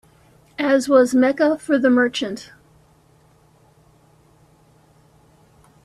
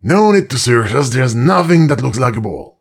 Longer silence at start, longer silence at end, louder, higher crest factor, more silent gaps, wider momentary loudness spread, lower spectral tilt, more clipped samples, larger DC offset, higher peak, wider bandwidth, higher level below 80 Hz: first, 0.6 s vs 0.05 s; first, 3.4 s vs 0.15 s; second, -18 LUFS vs -13 LUFS; first, 18 dB vs 12 dB; neither; first, 14 LU vs 6 LU; second, -4 dB/octave vs -6 dB/octave; neither; neither; second, -4 dBFS vs 0 dBFS; second, 13 kHz vs 15 kHz; second, -62 dBFS vs -46 dBFS